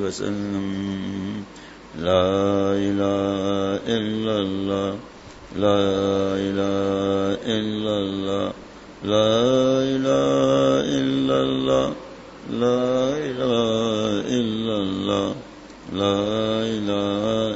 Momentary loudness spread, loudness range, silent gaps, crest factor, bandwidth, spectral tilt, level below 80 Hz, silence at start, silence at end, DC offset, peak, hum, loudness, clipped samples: 13 LU; 3 LU; none; 18 dB; 8 kHz; -6 dB/octave; -52 dBFS; 0 s; 0 s; under 0.1%; -4 dBFS; none; -22 LUFS; under 0.1%